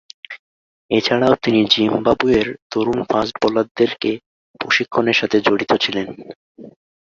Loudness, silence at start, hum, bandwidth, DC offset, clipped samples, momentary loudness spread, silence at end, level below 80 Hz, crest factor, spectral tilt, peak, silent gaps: -17 LUFS; 0.3 s; none; 7.4 kHz; under 0.1%; under 0.1%; 15 LU; 0.45 s; -50 dBFS; 18 dB; -5 dB/octave; -2 dBFS; 0.39-0.89 s, 2.62-2.70 s, 3.71-3.75 s, 4.26-4.54 s, 6.36-6.55 s